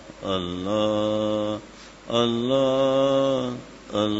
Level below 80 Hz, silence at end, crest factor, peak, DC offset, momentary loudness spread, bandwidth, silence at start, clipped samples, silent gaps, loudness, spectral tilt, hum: -54 dBFS; 0 s; 16 dB; -6 dBFS; under 0.1%; 12 LU; 8 kHz; 0 s; under 0.1%; none; -24 LUFS; -6 dB/octave; none